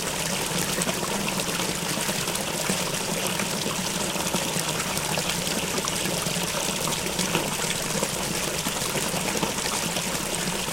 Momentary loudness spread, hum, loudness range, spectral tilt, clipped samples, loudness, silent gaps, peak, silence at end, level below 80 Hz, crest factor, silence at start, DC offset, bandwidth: 1 LU; none; 0 LU; -2.5 dB/octave; under 0.1%; -25 LUFS; none; -6 dBFS; 0 s; -48 dBFS; 22 dB; 0 s; under 0.1%; 17 kHz